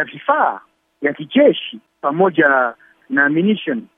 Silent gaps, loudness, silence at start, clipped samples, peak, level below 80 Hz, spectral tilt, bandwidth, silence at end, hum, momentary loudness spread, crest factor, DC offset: none; -16 LUFS; 0 s; under 0.1%; 0 dBFS; -72 dBFS; -8.5 dB/octave; 3.8 kHz; 0.15 s; none; 10 LU; 16 dB; under 0.1%